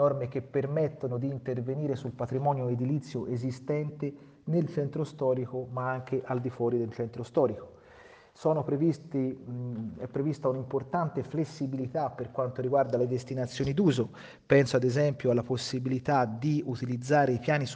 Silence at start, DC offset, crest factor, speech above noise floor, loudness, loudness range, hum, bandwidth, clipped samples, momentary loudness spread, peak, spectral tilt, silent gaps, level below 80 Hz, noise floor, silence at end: 0 s; under 0.1%; 22 dB; 25 dB; -30 LUFS; 5 LU; none; 9.4 kHz; under 0.1%; 8 LU; -8 dBFS; -7.5 dB/octave; none; -64 dBFS; -54 dBFS; 0 s